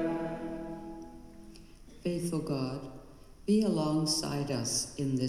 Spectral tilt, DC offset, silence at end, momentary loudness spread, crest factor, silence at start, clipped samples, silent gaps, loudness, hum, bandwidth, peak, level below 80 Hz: -5 dB/octave; under 0.1%; 0 s; 22 LU; 16 dB; 0 s; under 0.1%; none; -32 LUFS; none; 15.5 kHz; -18 dBFS; -56 dBFS